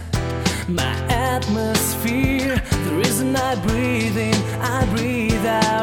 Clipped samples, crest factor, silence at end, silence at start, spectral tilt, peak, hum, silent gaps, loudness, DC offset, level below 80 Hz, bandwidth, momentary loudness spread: under 0.1%; 16 dB; 0 s; 0 s; -5 dB/octave; -4 dBFS; none; none; -20 LUFS; under 0.1%; -32 dBFS; 18 kHz; 3 LU